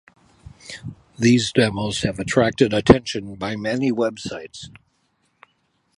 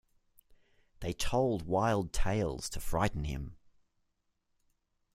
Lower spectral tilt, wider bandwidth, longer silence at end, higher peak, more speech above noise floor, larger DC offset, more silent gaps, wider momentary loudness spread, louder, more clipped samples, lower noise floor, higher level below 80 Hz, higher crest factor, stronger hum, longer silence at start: about the same, -5.5 dB/octave vs -5.5 dB/octave; second, 11.5 kHz vs 16 kHz; second, 1.3 s vs 1.6 s; first, 0 dBFS vs -14 dBFS; about the same, 47 dB vs 47 dB; neither; neither; first, 21 LU vs 11 LU; first, -20 LUFS vs -34 LUFS; neither; second, -67 dBFS vs -79 dBFS; about the same, -42 dBFS vs -44 dBFS; about the same, 22 dB vs 20 dB; neither; second, 0.65 s vs 1 s